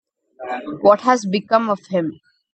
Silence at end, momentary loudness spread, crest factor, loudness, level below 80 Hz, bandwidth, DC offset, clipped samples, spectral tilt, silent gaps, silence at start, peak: 0.4 s; 14 LU; 18 dB; -18 LUFS; -68 dBFS; 8.6 kHz; under 0.1%; under 0.1%; -5.5 dB/octave; none; 0.4 s; 0 dBFS